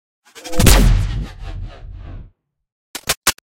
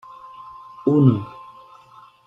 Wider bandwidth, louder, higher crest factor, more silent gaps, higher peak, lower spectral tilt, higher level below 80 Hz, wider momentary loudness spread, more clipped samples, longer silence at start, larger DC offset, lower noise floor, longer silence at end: first, 17 kHz vs 5.2 kHz; about the same, -17 LUFS vs -19 LUFS; about the same, 18 dB vs 20 dB; first, 2.72-2.94 s, 3.17-3.22 s vs none; first, 0 dBFS vs -4 dBFS; second, -3.5 dB/octave vs -11.5 dB/octave; first, -20 dBFS vs -62 dBFS; about the same, 24 LU vs 25 LU; neither; about the same, 0.35 s vs 0.4 s; neither; about the same, -47 dBFS vs -49 dBFS; second, 0.2 s vs 0.85 s